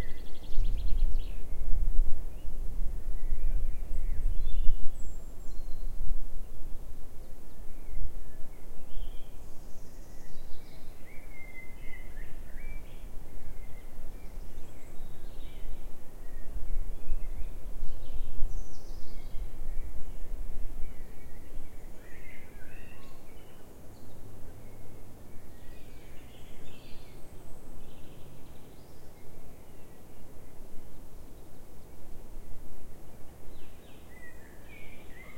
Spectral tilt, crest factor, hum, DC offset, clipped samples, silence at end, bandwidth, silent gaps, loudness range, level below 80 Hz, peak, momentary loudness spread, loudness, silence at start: -6 dB/octave; 20 dB; none; under 0.1%; under 0.1%; 0 s; 3.4 kHz; none; 14 LU; -34 dBFS; -4 dBFS; 15 LU; -45 LUFS; 0 s